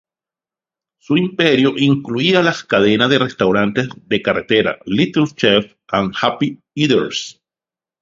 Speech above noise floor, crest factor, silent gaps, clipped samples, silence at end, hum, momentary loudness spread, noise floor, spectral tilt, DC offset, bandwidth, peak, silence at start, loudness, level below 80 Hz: over 74 dB; 16 dB; none; under 0.1%; 0.7 s; none; 8 LU; under -90 dBFS; -5.5 dB/octave; under 0.1%; 7.6 kHz; 0 dBFS; 1.1 s; -16 LUFS; -52 dBFS